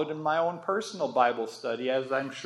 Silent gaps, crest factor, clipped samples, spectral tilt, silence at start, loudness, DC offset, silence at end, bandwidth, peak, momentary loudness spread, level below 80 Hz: none; 20 dB; under 0.1%; -4.5 dB/octave; 0 s; -29 LUFS; under 0.1%; 0 s; 12.5 kHz; -8 dBFS; 6 LU; -86 dBFS